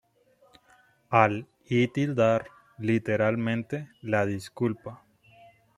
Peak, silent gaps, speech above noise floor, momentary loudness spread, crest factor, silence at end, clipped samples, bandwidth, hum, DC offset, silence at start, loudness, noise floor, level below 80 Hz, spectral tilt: -4 dBFS; none; 37 dB; 13 LU; 24 dB; 0.8 s; under 0.1%; 13.5 kHz; none; under 0.1%; 1.1 s; -27 LUFS; -63 dBFS; -66 dBFS; -7.5 dB/octave